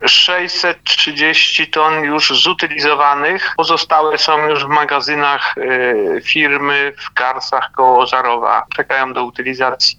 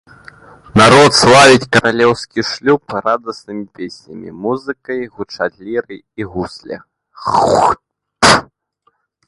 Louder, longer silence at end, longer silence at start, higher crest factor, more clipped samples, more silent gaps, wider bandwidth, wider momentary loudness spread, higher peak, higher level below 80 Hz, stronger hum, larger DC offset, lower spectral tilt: about the same, -13 LUFS vs -12 LUFS; second, 0.05 s vs 0.85 s; second, 0 s vs 0.75 s; about the same, 12 dB vs 14 dB; neither; neither; second, 11.5 kHz vs 16 kHz; second, 7 LU vs 22 LU; about the same, 0 dBFS vs 0 dBFS; second, -56 dBFS vs -44 dBFS; neither; neither; second, -2 dB/octave vs -4 dB/octave